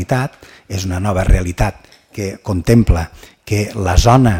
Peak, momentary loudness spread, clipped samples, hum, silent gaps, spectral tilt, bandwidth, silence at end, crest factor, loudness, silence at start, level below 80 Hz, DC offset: 0 dBFS; 13 LU; under 0.1%; none; none; -6.5 dB/octave; 16.5 kHz; 0 s; 14 dB; -16 LUFS; 0 s; -22 dBFS; under 0.1%